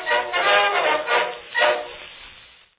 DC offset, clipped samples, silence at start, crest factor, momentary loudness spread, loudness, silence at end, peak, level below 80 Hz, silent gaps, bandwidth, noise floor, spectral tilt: under 0.1%; under 0.1%; 0 s; 18 dB; 20 LU; -19 LUFS; 0.4 s; -4 dBFS; -62 dBFS; none; 4 kHz; -48 dBFS; -4.5 dB/octave